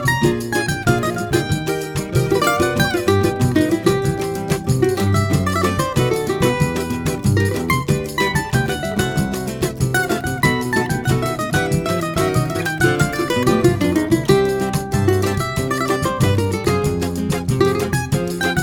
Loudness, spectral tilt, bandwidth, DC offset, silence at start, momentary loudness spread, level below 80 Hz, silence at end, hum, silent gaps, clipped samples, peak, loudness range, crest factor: -18 LUFS; -5.5 dB/octave; 19 kHz; under 0.1%; 0 s; 5 LU; -36 dBFS; 0 s; none; none; under 0.1%; -2 dBFS; 2 LU; 16 dB